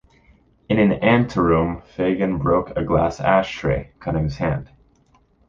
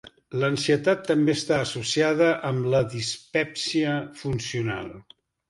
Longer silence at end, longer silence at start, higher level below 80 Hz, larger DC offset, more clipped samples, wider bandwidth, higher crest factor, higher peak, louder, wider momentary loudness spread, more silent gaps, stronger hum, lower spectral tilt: first, 0.85 s vs 0.5 s; first, 0.7 s vs 0.05 s; first, -38 dBFS vs -58 dBFS; neither; neither; second, 7.4 kHz vs 11.5 kHz; about the same, 18 dB vs 18 dB; first, -2 dBFS vs -8 dBFS; first, -20 LUFS vs -25 LUFS; about the same, 7 LU vs 8 LU; neither; neither; first, -8 dB/octave vs -5 dB/octave